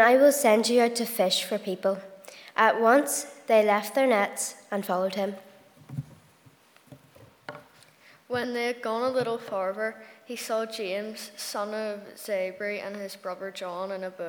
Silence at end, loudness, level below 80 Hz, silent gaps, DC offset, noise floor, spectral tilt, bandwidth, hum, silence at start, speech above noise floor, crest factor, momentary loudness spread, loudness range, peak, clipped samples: 0 s; -27 LUFS; -76 dBFS; none; under 0.1%; -58 dBFS; -3 dB/octave; over 20 kHz; none; 0 s; 32 dB; 22 dB; 18 LU; 11 LU; -6 dBFS; under 0.1%